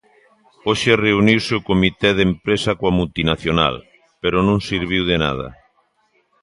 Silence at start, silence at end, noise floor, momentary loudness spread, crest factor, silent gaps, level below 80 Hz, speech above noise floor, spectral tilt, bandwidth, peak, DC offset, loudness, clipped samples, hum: 0.65 s; 0.9 s; -63 dBFS; 7 LU; 18 dB; none; -38 dBFS; 45 dB; -5.5 dB/octave; 11.5 kHz; 0 dBFS; under 0.1%; -18 LUFS; under 0.1%; none